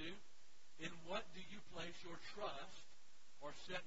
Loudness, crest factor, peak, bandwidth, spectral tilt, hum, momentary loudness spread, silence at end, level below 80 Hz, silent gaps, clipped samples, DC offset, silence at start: -52 LUFS; 20 dB; -32 dBFS; 7.6 kHz; -2 dB/octave; none; 20 LU; 0 s; -74 dBFS; none; under 0.1%; 0.4%; 0 s